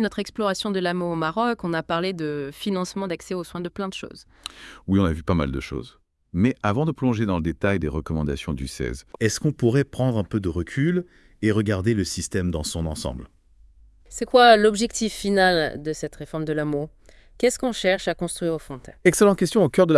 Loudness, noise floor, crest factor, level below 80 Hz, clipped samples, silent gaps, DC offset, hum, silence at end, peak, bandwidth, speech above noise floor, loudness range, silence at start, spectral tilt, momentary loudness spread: -23 LUFS; -53 dBFS; 20 dB; -44 dBFS; under 0.1%; none; under 0.1%; none; 0 s; -2 dBFS; 12 kHz; 30 dB; 7 LU; 0 s; -5.5 dB/octave; 13 LU